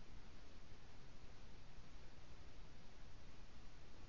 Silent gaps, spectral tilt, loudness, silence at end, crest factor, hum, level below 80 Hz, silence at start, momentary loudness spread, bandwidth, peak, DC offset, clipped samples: none; -4.5 dB/octave; -64 LUFS; 0 s; 12 dB; none; -60 dBFS; 0 s; 1 LU; 7.2 kHz; -40 dBFS; 0.3%; under 0.1%